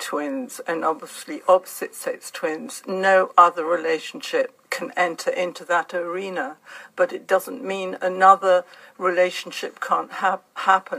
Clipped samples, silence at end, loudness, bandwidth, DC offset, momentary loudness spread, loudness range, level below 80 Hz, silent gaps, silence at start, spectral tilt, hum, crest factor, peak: under 0.1%; 0 s; -22 LUFS; 15.5 kHz; under 0.1%; 14 LU; 4 LU; -82 dBFS; none; 0 s; -3.5 dB/octave; none; 22 dB; 0 dBFS